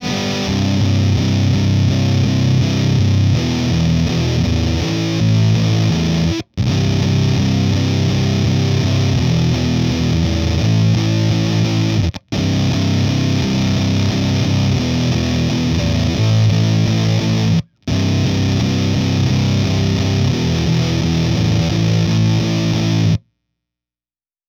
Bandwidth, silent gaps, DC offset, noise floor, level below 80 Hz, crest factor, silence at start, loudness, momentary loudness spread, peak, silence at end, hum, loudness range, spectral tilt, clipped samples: 15 kHz; none; under 0.1%; under -90 dBFS; -32 dBFS; 10 dB; 0 s; -16 LUFS; 3 LU; -4 dBFS; 1.3 s; none; 1 LU; -6 dB/octave; under 0.1%